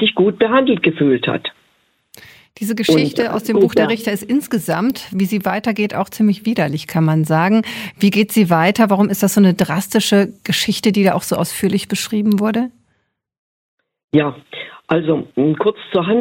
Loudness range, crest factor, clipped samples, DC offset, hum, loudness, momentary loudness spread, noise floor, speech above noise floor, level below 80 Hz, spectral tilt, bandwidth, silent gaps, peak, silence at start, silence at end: 6 LU; 16 dB; under 0.1%; under 0.1%; none; -16 LUFS; 7 LU; -66 dBFS; 51 dB; -56 dBFS; -5.5 dB/octave; 17 kHz; 13.39-13.78 s, 14.04-14.08 s; 0 dBFS; 0 s; 0 s